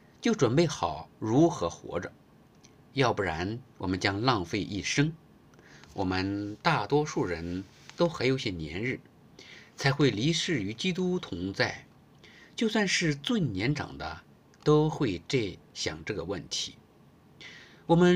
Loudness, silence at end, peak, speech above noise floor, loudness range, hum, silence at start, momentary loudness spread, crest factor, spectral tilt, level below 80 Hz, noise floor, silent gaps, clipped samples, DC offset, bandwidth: -29 LUFS; 0 s; -10 dBFS; 30 dB; 2 LU; none; 0.2 s; 14 LU; 20 dB; -5 dB/octave; -58 dBFS; -58 dBFS; none; under 0.1%; under 0.1%; 15 kHz